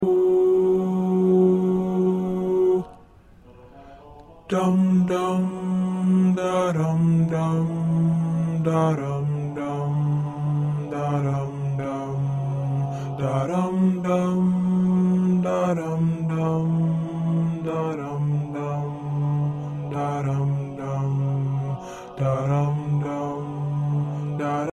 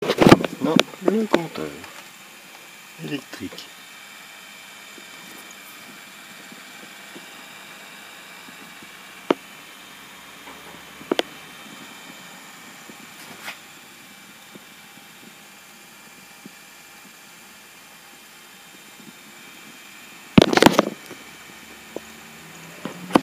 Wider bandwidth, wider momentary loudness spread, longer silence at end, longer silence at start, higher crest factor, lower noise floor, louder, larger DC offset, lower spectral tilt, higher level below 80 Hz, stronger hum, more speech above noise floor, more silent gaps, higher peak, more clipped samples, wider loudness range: second, 10.5 kHz vs 19.5 kHz; second, 8 LU vs 23 LU; about the same, 0 s vs 0 s; about the same, 0 s vs 0 s; second, 14 dB vs 26 dB; about the same, -49 dBFS vs -46 dBFS; about the same, -23 LUFS vs -21 LUFS; neither; first, -9 dB/octave vs -5 dB/octave; about the same, -54 dBFS vs -54 dBFS; neither; first, 29 dB vs 20 dB; neither; second, -8 dBFS vs 0 dBFS; neither; second, 4 LU vs 21 LU